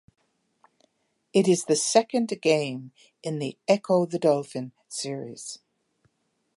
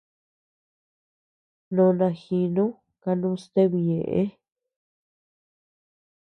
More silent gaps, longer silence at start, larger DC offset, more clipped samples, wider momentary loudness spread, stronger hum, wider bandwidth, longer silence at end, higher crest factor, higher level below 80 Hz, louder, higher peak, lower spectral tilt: neither; second, 1.35 s vs 1.7 s; neither; neither; first, 16 LU vs 8 LU; neither; first, 11.5 kHz vs 9.2 kHz; second, 1 s vs 1.9 s; about the same, 22 dB vs 18 dB; second, -78 dBFS vs -66 dBFS; about the same, -25 LUFS vs -24 LUFS; first, -4 dBFS vs -8 dBFS; second, -4.5 dB/octave vs -10 dB/octave